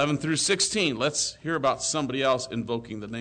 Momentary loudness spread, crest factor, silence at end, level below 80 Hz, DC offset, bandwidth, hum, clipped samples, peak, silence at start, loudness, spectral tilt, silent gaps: 9 LU; 14 dB; 0 s; -58 dBFS; under 0.1%; 9.4 kHz; none; under 0.1%; -12 dBFS; 0 s; -25 LUFS; -3 dB/octave; none